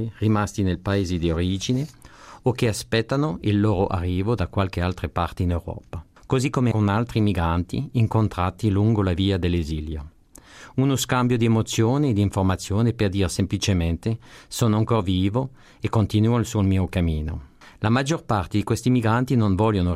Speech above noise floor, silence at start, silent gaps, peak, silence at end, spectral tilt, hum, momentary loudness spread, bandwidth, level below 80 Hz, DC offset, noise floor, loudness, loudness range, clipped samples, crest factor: 26 dB; 0 s; none; -8 dBFS; 0 s; -6.5 dB/octave; none; 8 LU; 15.5 kHz; -42 dBFS; under 0.1%; -48 dBFS; -23 LUFS; 2 LU; under 0.1%; 14 dB